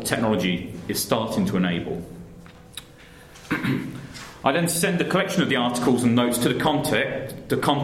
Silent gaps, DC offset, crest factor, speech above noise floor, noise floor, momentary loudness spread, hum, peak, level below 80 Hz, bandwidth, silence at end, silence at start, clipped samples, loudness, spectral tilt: none; under 0.1%; 20 dB; 24 dB; -46 dBFS; 18 LU; none; -4 dBFS; -52 dBFS; 16 kHz; 0 s; 0 s; under 0.1%; -23 LUFS; -4.5 dB/octave